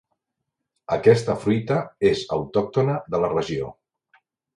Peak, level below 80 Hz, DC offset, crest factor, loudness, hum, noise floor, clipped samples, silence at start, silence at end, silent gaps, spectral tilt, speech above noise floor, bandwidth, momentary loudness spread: -2 dBFS; -54 dBFS; under 0.1%; 22 dB; -22 LUFS; none; -81 dBFS; under 0.1%; 0.9 s; 0.85 s; none; -7 dB/octave; 60 dB; 11.5 kHz; 10 LU